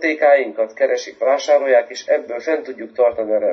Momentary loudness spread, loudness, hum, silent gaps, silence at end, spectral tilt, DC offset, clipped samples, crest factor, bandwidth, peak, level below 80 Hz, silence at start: 8 LU; -18 LUFS; none; none; 0 s; -2.5 dB/octave; under 0.1%; under 0.1%; 14 dB; 7.4 kHz; -2 dBFS; -66 dBFS; 0 s